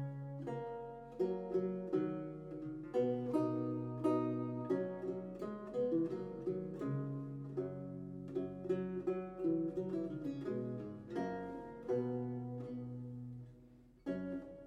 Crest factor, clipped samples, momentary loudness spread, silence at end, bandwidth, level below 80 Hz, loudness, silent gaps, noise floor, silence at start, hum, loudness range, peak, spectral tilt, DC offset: 18 dB; under 0.1%; 10 LU; 0 s; 9.8 kHz; -68 dBFS; -41 LUFS; none; -62 dBFS; 0 s; none; 4 LU; -22 dBFS; -9.5 dB/octave; under 0.1%